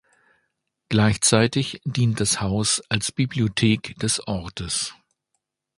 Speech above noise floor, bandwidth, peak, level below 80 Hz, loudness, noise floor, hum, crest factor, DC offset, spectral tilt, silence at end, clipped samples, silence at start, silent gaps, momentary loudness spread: 55 dB; 11.5 kHz; -2 dBFS; -48 dBFS; -22 LUFS; -78 dBFS; none; 22 dB; under 0.1%; -4 dB/octave; 0.85 s; under 0.1%; 0.9 s; none; 9 LU